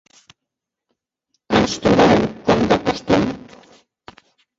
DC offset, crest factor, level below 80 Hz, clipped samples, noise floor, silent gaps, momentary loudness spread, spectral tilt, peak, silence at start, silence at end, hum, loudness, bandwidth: under 0.1%; 18 dB; -44 dBFS; under 0.1%; -83 dBFS; none; 6 LU; -5.5 dB/octave; -2 dBFS; 1.5 s; 1.2 s; none; -17 LUFS; 8 kHz